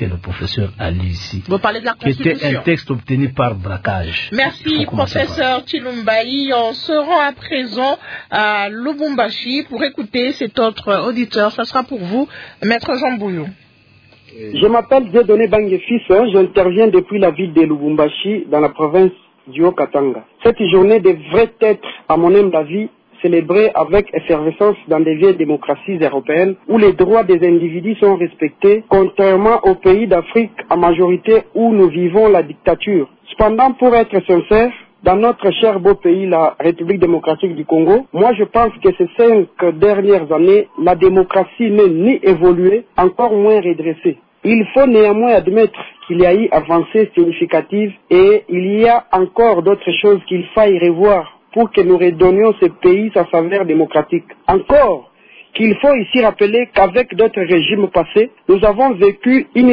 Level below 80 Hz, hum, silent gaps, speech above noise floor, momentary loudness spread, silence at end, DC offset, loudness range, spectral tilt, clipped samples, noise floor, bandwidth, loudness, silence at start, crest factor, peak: -40 dBFS; none; none; 36 dB; 9 LU; 0 s; under 0.1%; 5 LU; -8 dB/octave; under 0.1%; -48 dBFS; 5.4 kHz; -13 LUFS; 0 s; 12 dB; 0 dBFS